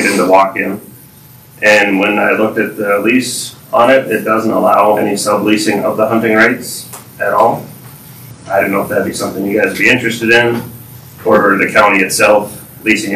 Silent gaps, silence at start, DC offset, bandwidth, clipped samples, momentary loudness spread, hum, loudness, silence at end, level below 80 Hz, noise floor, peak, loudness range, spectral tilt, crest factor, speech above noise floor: none; 0 s; under 0.1%; 16 kHz; 0.2%; 11 LU; none; -11 LUFS; 0 s; -50 dBFS; -39 dBFS; 0 dBFS; 3 LU; -4 dB/octave; 12 dB; 27 dB